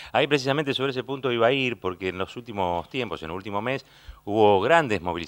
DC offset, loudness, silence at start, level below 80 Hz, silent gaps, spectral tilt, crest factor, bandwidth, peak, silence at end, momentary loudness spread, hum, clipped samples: under 0.1%; -24 LUFS; 0 s; -54 dBFS; none; -5.5 dB/octave; 22 dB; 16.5 kHz; -4 dBFS; 0 s; 12 LU; none; under 0.1%